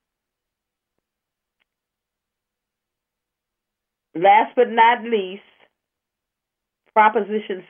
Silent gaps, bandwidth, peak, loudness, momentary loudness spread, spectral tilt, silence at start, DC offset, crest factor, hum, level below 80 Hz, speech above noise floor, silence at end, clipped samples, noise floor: none; 3.6 kHz; -2 dBFS; -17 LUFS; 11 LU; -8 dB/octave; 4.15 s; under 0.1%; 22 dB; none; -88 dBFS; 67 dB; 0.1 s; under 0.1%; -84 dBFS